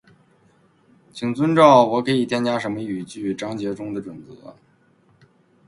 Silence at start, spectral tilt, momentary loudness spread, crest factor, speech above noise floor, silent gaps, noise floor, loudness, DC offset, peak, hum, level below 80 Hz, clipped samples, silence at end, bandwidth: 1.15 s; -6 dB/octave; 19 LU; 22 dB; 38 dB; none; -58 dBFS; -20 LUFS; under 0.1%; 0 dBFS; none; -62 dBFS; under 0.1%; 1.15 s; 11.5 kHz